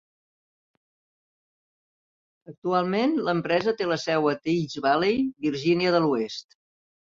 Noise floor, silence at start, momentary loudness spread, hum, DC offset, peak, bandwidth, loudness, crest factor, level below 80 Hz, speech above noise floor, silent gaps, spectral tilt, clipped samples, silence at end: under -90 dBFS; 2.5 s; 5 LU; none; under 0.1%; -10 dBFS; 7.6 kHz; -25 LUFS; 18 dB; -66 dBFS; over 66 dB; 2.58-2.62 s; -6 dB/octave; under 0.1%; 0.7 s